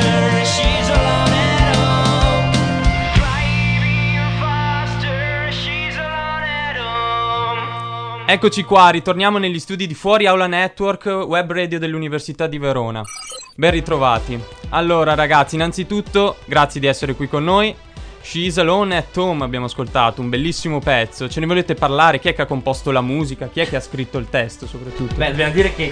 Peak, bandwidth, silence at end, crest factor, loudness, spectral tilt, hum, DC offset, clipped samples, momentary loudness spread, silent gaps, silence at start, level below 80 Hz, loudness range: 0 dBFS; 10 kHz; 0 s; 16 dB; -17 LUFS; -5 dB/octave; none; under 0.1%; under 0.1%; 9 LU; none; 0 s; -30 dBFS; 5 LU